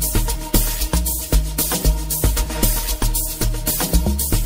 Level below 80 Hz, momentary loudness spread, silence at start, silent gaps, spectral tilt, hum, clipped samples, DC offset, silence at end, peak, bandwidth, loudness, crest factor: -20 dBFS; 2 LU; 0 s; none; -3.5 dB/octave; none; under 0.1%; under 0.1%; 0 s; -2 dBFS; 16.5 kHz; -20 LUFS; 16 dB